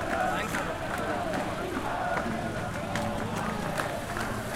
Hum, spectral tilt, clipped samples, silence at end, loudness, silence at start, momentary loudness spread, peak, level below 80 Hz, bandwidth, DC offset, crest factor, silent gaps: none; -5 dB/octave; under 0.1%; 0 s; -31 LUFS; 0 s; 4 LU; -14 dBFS; -46 dBFS; 16.5 kHz; under 0.1%; 18 dB; none